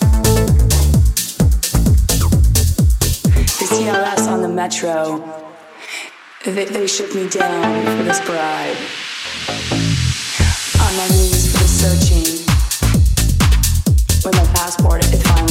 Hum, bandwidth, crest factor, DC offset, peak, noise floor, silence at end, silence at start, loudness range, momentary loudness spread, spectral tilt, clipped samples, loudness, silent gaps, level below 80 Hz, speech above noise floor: none; 17 kHz; 14 dB; under 0.1%; 0 dBFS; -35 dBFS; 0 s; 0 s; 6 LU; 9 LU; -4.5 dB/octave; under 0.1%; -15 LUFS; none; -18 dBFS; 20 dB